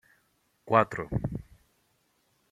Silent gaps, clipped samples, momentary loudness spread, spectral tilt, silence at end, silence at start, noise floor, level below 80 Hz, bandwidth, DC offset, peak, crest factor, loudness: none; under 0.1%; 13 LU; -8 dB/octave; 1.1 s; 0.65 s; -71 dBFS; -52 dBFS; 14 kHz; under 0.1%; -6 dBFS; 26 dB; -28 LUFS